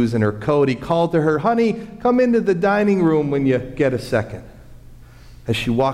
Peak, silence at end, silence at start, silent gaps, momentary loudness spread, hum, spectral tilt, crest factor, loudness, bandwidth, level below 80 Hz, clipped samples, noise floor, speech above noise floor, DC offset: -6 dBFS; 0 s; 0 s; none; 7 LU; none; -7.5 dB/octave; 12 dB; -18 LUFS; 14.5 kHz; -44 dBFS; under 0.1%; -41 dBFS; 24 dB; under 0.1%